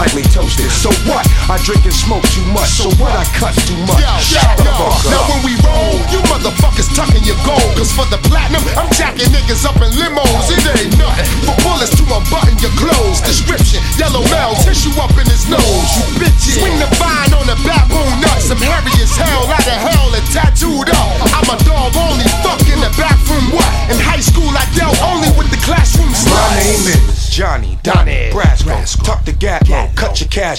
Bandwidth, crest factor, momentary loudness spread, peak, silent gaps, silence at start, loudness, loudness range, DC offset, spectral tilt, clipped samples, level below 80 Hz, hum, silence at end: 17 kHz; 10 dB; 3 LU; 0 dBFS; none; 0 s; -11 LUFS; 1 LU; under 0.1%; -4 dB/octave; under 0.1%; -12 dBFS; none; 0 s